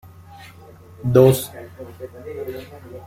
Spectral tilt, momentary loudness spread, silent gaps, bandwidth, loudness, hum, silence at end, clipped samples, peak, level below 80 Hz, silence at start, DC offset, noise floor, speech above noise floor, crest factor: -7 dB/octave; 24 LU; none; 16.5 kHz; -17 LUFS; none; 0.1 s; under 0.1%; -2 dBFS; -50 dBFS; 1.05 s; under 0.1%; -44 dBFS; 25 dB; 20 dB